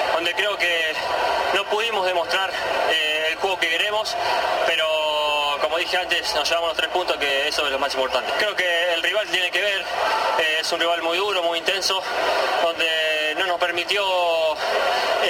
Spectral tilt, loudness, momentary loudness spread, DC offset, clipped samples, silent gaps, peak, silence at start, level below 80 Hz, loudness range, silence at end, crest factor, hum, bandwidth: -1 dB/octave; -20 LUFS; 3 LU; under 0.1%; under 0.1%; none; -8 dBFS; 0 s; -56 dBFS; 0 LU; 0 s; 14 dB; none; 16.5 kHz